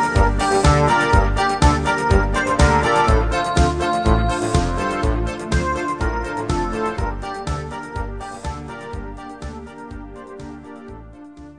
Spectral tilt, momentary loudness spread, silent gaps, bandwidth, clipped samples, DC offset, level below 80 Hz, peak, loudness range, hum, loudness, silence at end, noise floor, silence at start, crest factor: -5.5 dB/octave; 20 LU; none; 10 kHz; under 0.1%; 0.2%; -24 dBFS; -2 dBFS; 15 LU; none; -19 LUFS; 0.05 s; -39 dBFS; 0 s; 18 dB